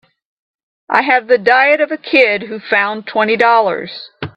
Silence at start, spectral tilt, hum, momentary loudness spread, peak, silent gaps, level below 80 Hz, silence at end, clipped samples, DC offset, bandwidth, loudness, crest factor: 0.9 s; -5.5 dB/octave; none; 9 LU; 0 dBFS; none; -62 dBFS; 0.05 s; under 0.1%; under 0.1%; 7.8 kHz; -13 LUFS; 14 dB